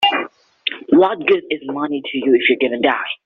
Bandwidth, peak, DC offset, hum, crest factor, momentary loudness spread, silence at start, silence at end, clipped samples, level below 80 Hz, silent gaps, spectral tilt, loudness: 5.6 kHz; 0 dBFS; under 0.1%; none; 16 dB; 10 LU; 0 s; 0.1 s; under 0.1%; -60 dBFS; none; -1 dB/octave; -17 LUFS